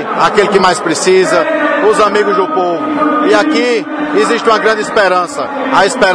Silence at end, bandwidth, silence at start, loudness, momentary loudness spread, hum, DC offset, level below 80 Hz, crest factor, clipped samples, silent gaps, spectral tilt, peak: 0 s; 10.5 kHz; 0 s; -11 LUFS; 5 LU; none; under 0.1%; -48 dBFS; 10 dB; 0.4%; none; -3.5 dB/octave; 0 dBFS